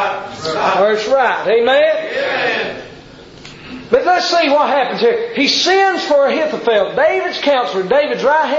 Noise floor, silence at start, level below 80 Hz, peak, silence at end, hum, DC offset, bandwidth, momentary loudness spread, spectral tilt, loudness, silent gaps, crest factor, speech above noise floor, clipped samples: -37 dBFS; 0 s; -52 dBFS; -2 dBFS; 0 s; none; under 0.1%; 7.8 kHz; 8 LU; -3 dB/octave; -14 LUFS; none; 12 dB; 24 dB; under 0.1%